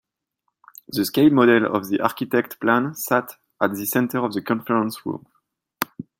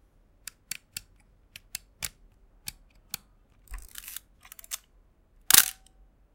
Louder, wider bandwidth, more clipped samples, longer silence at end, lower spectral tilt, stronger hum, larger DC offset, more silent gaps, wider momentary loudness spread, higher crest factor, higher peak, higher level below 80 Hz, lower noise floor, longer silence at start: first, -21 LUFS vs -24 LUFS; about the same, 17 kHz vs 17 kHz; neither; second, 0.2 s vs 0.65 s; first, -5 dB/octave vs 1.5 dB/octave; neither; neither; neither; second, 14 LU vs 28 LU; second, 22 dB vs 34 dB; about the same, 0 dBFS vs 0 dBFS; second, -66 dBFS vs -54 dBFS; first, -76 dBFS vs -62 dBFS; second, 0.9 s vs 2 s